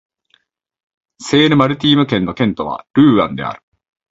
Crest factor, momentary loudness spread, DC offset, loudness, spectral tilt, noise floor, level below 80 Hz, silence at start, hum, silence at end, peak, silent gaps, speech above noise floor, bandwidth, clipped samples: 16 dB; 14 LU; under 0.1%; -14 LUFS; -6 dB/octave; -60 dBFS; -48 dBFS; 1.2 s; none; 0.55 s; 0 dBFS; 2.90-2.94 s; 46 dB; 8 kHz; under 0.1%